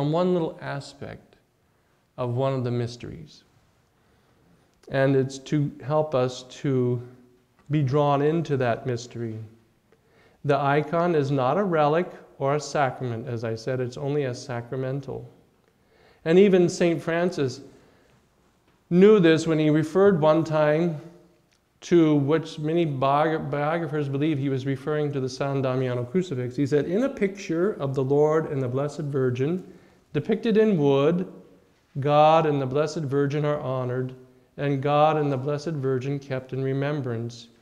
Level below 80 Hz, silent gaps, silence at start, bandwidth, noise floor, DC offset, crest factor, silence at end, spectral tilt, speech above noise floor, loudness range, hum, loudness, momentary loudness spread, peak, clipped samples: -62 dBFS; none; 0 s; 10.5 kHz; -65 dBFS; under 0.1%; 18 dB; 0.15 s; -7 dB/octave; 42 dB; 7 LU; none; -24 LUFS; 13 LU; -6 dBFS; under 0.1%